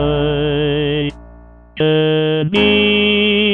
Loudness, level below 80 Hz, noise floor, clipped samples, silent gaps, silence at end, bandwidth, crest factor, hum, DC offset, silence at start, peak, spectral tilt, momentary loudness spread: -14 LUFS; -34 dBFS; -40 dBFS; under 0.1%; none; 0 s; 5.6 kHz; 14 dB; none; 0.2%; 0 s; -2 dBFS; -7.5 dB/octave; 7 LU